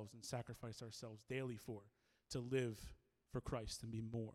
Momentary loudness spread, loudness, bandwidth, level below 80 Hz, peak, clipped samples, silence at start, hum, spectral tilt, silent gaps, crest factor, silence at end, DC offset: 11 LU; -48 LUFS; 15.5 kHz; -64 dBFS; -30 dBFS; under 0.1%; 0 s; none; -5.5 dB/octave; none; 18 dB; 0 s; under 0.1%